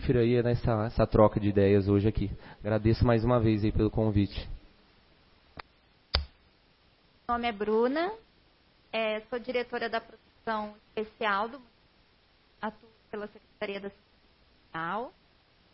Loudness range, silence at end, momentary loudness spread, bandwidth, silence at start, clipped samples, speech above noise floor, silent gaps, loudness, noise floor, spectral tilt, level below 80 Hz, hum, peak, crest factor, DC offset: 14 LU; 0.65 s; 19 LU; 5.8 kHz; 0 s; under 0.1%; 36 dB; none; -29 LUFS; -64 dBFS; -11 dB/octave; -44 dBFS; none; -6 dBFS; 24 dB; under 0.1%